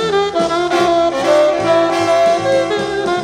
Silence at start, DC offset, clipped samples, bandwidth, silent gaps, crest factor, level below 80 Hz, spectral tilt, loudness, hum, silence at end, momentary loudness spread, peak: 0 s; under 0.1%; under 0.1%; 13.5 kHz; none; 12 dB; -48 dBFS; -4.5 dB/octave; -14 LUFS; none; 0 s; 4 LU; -2 dBFS